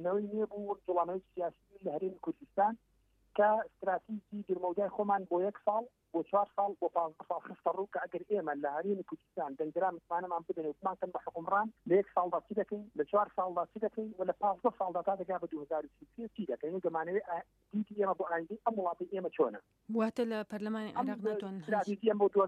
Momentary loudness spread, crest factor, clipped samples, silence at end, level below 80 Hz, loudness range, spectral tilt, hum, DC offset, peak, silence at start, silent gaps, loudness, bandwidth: 8 LU; 18 dB; under 0.1%; 0 s; -76 dBFS; 3 LU; -8 dB/octave; none; under 0.1%; -16 dBFS; 0 s; none; -35 LUFS; 9 kHz